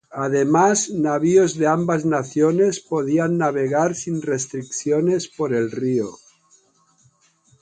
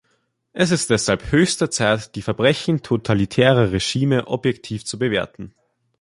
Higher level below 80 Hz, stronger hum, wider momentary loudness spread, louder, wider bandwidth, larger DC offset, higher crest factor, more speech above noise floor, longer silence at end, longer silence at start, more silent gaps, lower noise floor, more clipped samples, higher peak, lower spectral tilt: second, -64 dBFS vs -44 dBFS; neither; second, 8 LU vs 11 LU; about the same, -20 LUFS vs -19 LUFS; second, 9.6 kHz vs 11.5 kHz; neither; about the same, 16 dB vs 18 dB; second, 40 dB vs 48 dB; first, 1.45 s vs 0.5 s; second, 0.1 s vs 0.55 s; neither; second, -59 dBFS vs -67 dBFS; neither; about the same, -4 dBFS vs -2 dBFS; about the same, -5.5 dB/octave vs -5 dB/octave